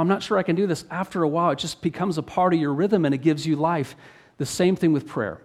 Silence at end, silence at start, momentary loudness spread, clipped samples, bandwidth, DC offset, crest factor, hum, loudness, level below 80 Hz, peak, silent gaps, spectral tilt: 0.05 s; 0 s; 7 LU; under 0.1%; 14 kHz; under 0.1%; 16 dB; none; -23 LUFS; -60 dBFS; -8 dBFS; none; -6 dB/octave